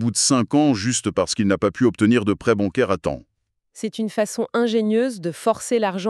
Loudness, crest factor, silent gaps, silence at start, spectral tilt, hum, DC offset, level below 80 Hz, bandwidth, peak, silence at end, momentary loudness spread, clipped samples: -20 LUFS; 16 dB; none; 0 s; -4.5 dB/octave; none; under 0.1%; -52 dBFS; 13 kHz; -4 dBFS; 0 s; 8 LU; under 0.1%